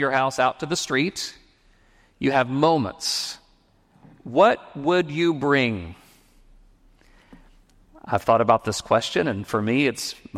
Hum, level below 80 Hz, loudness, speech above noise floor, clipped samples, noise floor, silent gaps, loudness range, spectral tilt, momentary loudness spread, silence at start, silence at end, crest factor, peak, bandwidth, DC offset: none; -56 dBFS; -22 LUFS; 38 dB; under 0.1%; -60 dBFS; none; 4 LU; -4.5 dB/octave; 12 LU; 0 s; 0 s; 20 dB; -4 dBFS; 16 kHz; under 0.1%